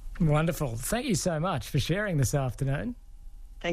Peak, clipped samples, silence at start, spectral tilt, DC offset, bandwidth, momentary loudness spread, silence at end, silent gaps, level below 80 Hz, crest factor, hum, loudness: -14 dBFS; under 0.1%; 0 s; -5.5 dB/octave; under 0.1%; 14.5 kHz; 7 LU; 0 s; none; -42 dBFS; 14 dB; none; -29 LUFS